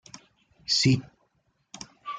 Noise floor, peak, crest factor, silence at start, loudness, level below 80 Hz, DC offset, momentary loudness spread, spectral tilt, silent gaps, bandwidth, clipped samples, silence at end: -71 dBFS; -10 dBFS; 20 dB; 0.15 s; -24 LUFS; -62 dBFS; under 0.1%; 22 LU; -4 dB/octave; none; 9.6 kHz; under 0.1%; 0 s